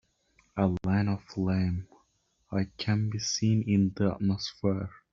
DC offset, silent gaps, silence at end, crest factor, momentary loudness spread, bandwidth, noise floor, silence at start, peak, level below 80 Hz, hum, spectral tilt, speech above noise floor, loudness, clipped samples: under 0.1%; none; 0.2 s; 18 dB; 7 LU; 7.6 kHz; -72 dBFS; 0.55 s; -10 dBFS; -58 dBFS; none; -6.5 dB/octave; 43 dB; -29 LUFS; under 0.1%